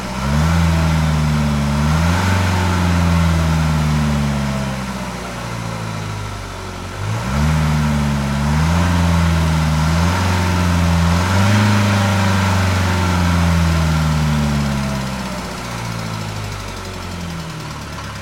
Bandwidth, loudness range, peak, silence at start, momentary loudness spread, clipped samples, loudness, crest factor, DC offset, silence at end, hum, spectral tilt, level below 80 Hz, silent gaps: 16.5 kHz; 7 LU; -2 dBFS; 0 s; 11 LU; under 0.1%; -17 LUFS; 14 dB; under 0.1%; 0 s; none; -5.5 dB/octave; -28 dBFS; none